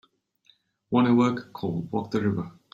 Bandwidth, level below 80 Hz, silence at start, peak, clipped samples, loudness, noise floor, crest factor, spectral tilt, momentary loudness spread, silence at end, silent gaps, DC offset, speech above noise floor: 7.6 kHz; -64 dBFS; 0.9 s; -8 dBFS; under 0.1%; -26 LUFS; -64 dBFS; 18 dB; -8 dB/octave; 11 LU; 0.25 s; none; under 0.1%; 40 dB